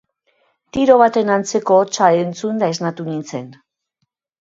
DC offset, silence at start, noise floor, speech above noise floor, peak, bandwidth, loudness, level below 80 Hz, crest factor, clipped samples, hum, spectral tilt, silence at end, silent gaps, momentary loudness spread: under 0.1%; 0.75 s; -73 dBFS; 57 dB; 0 dBFS; 7.8 kHz; -16 LUFS; -56 dBFS; 18 dB; under 0.1%; none; -5 dB/octave; 0.9 s; none; 14 LU